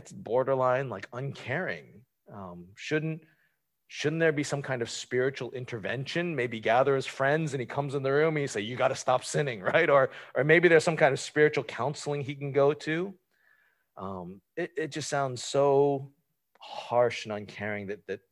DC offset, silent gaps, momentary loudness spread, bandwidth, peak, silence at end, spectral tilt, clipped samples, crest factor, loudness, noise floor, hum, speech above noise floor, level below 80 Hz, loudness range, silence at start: under 0.1%; none; 16 LU; 12 kHz; -8 dBFS; 0.15 s; -5 dB/octave; under 0.1%; 20 dB; -28 LUFS; -74 dBFS; none; 46 dB; -70 dBFS; 8 LU; 0.05 s